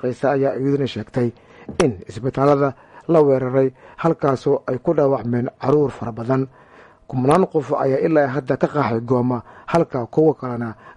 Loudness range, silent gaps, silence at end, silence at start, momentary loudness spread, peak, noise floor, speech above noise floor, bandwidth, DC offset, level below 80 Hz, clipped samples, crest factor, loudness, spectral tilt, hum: 2 LU; none; 0.05 s; 0.05 s; 9 LU; -2 dBFS; -46 dBFS; 27 dB; 11.5 kHz; under 0.1%; -52 dBFS; under 0.1%; 16 dB; -20 LUFS; -8 dB/octave; none